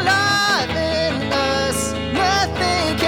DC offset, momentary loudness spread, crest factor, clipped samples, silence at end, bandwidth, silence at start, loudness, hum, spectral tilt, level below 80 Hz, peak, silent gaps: under 0.1%; 5 LU; 14 dB; under 0.1%; 0 s; 19.5 kHz; 0 s; -18 LUFS; none; -3.5 dB/octave; -40 dBFS; -4 dBFS; none